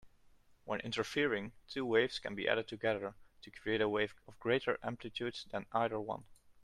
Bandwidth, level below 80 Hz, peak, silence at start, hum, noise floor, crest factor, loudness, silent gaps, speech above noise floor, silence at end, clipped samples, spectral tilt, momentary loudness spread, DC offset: 12.5 kHz; -68 dBFS; -16 dBFS; 0.05 s; none; -65 dBFS; 22 dB; -37 LUFS; none; 28 dB; 0.1 s; under 0.1%; -5 dB/octave; 11 LU; under 0.1%